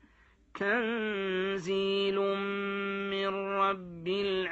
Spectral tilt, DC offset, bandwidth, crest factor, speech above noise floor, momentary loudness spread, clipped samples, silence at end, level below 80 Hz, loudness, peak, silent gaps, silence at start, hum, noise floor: -5.5 dB/octave; under 0.1%; 8 kHz; 16 dB; 32 dB; 4 LU; under 0.1%; 0 s; -66 dBFS; -31 LUFS; -16 dBFS; none; 0.55 s; none; -63 dBFS